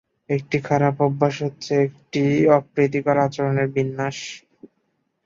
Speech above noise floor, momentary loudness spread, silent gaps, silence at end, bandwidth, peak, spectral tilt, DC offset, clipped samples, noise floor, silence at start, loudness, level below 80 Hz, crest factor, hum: 51 dB; 10 LU; none; 0.85 s; 7.6 kHz; -2 dBFS; -7 dB/octave; under 0.1%; under 0.1%; -71 dBFS; 0.3 s; -21 LUFS; -60 dBFS; 18 dB; none